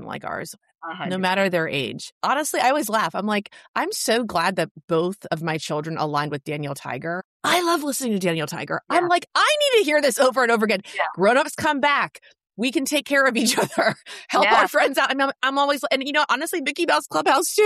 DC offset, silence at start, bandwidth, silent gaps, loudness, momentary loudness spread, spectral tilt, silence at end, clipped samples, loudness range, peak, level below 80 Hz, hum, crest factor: under 0.1%; 0 s; 14.5 kHz; 2.12-2.21 s, 3.68-3.74 s, 4.71-4.75 s, 4.84-4.88 s, 7.25-7.40 s; -21 LUFS; 11 LU; -3.5 dB/octave; 0 s; under 0.1%; 5 LU; -6 dBFS; -66 dBFS; none; 16 dB